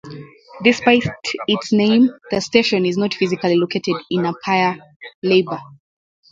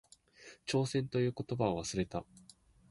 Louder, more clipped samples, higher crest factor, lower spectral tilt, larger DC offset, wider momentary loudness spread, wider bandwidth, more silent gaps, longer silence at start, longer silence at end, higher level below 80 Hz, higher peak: first, -18 LUFS vs -36 LUFS; neither; about the same, 18 dB vs 20 dB; about the same, -5.5 dB/octave vs -5.5 dB/octave; neither; second, 10 LU vs 21 LU; second, 7.8 kHz vs 11.5 kHz; first, 4.96-5.00 s, 5.14-5.22 s vs none; second, 0.05 s vs 0.4 s; about the same, 0.65 s vs 0.7 s; about the same, -56 dBFS vs -60 dBFS; first, 0 dBFS vs -18 dBFS